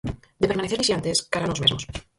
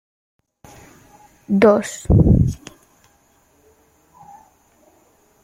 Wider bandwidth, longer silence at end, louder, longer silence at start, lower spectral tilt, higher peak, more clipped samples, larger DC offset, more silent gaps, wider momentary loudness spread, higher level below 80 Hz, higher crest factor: second, 11.5 kHz vs 15.5 kHz; second, 0.15 s vs 2.9 s; second, -23 LUFS vs -16 LUFS; second, 0.05 s vs 1.5 s; second, -3.5 dB/octave vs -7.5 dB/octave; about the same, -4 dBFS vs -2 dBFS; neither; neither; neither; about the same, 7 LU vs 9 LU; second, -44 dBFS vs -32 dBFS; about the same, 20 dB vs 18 dB